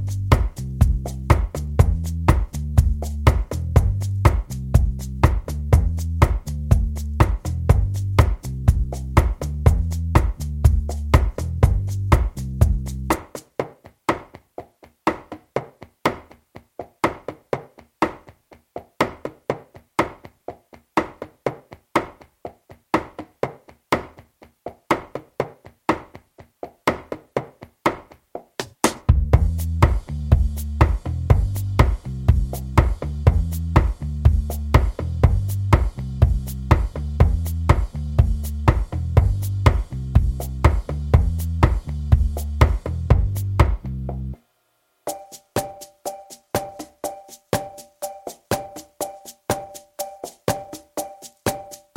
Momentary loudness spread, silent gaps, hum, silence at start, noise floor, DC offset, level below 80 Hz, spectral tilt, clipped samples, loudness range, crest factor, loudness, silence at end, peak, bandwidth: 15 LU; none; none; 0 s; -67 dBFS; under 0.1%; -26 dBFS; -6.5 dB/octave; under 0.1%; 9 LU; 20 dB; -22 LUFS; 0.2 s; 0 dBFS; 16.5 kHz